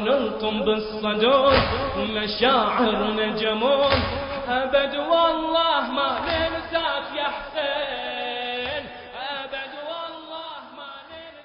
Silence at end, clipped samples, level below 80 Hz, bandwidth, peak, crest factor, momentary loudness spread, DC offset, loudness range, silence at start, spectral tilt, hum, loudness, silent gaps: 0 s; under 0.1%; -44 dBFS; 5.4 kHz; -2 dBFS; 22 dB; 15 LU; under 0.1%; 8 LU; 0 s; -9 dB/octave; none; -23 LUFS; none